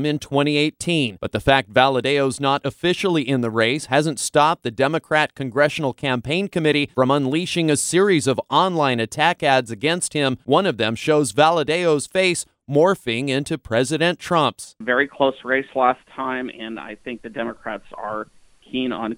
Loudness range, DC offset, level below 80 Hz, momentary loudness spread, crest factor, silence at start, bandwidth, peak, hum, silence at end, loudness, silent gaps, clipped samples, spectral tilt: 4 LU; under 0.1%; -52 dBFS; 11 LU; 20 dB; 0 s; 16.5 kHz; 0 dBFS; none; 0 s; -20 LUFS; none; under 0.1%; -4.5 dB/octave